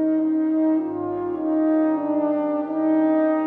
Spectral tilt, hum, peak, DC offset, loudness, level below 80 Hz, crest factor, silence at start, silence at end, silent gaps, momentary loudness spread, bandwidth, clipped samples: -10 dB/octave; none; -10 dBFS; under 0.1%; -22 LUFS; -68 dBFS; 10 dB; 0 s; 0 s; none; 6 LU; 3.3 kHz; under 0.1%